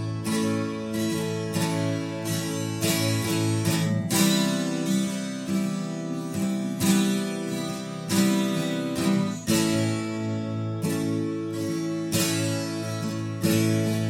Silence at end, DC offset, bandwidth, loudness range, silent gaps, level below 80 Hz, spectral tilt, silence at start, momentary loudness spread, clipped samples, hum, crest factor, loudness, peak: 0 s; under 0.1%; 16.5 kHz; 2 LU; none; -62 dBFS; -5 dB/octave; 0 s; 7 LU; under 0.1%; none; 18 dB; -26 LUFS; -8 dBFS